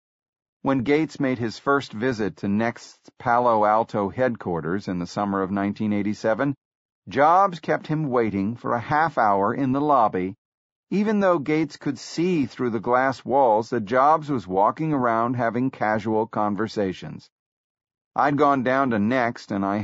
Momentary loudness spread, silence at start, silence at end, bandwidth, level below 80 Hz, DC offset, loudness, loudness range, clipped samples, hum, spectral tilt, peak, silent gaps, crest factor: 9 LU; 0.65 s; 0 s; 8 kHz; -60 dBFS; under 0.1%; -23 LUFS; 3 LU; under 0.1%; none; -5.5 dB/octave; -6 dBFS; 6.57-7.02 s, 10.38-10.87 s, 17.32-17.75 s, 18.01-18.11 s; 16 dB